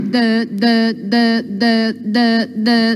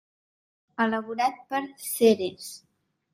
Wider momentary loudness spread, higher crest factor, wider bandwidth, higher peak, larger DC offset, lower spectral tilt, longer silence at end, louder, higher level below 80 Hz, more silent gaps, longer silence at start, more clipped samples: second, 2 LU vs 19 LU; second, 12 dB vs 20 dB; second, 11.5 kHz vs 16 kHz; first, -2 dBFS vs -8 dBFS; neither; first, -6 dB/octave vs -4 dB/octave; second, 0 s vs 0.55 s; first, -15 LUFS vs -26 LUFS; about the same, -78 dBFS vs -74 dBFS; neither; second, 0 s vs 0.8 s; neither